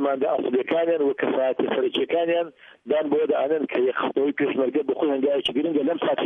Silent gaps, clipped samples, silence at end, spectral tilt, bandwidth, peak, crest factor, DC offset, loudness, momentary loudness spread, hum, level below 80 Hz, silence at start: none; under 0.1%; 0 s; -6.5 dB/octave; 9.6 kHz; -10 dBFS; 12 dB; under 0.1%; -23 LUFS; 2 LU; none; -72 dBFS; 0 s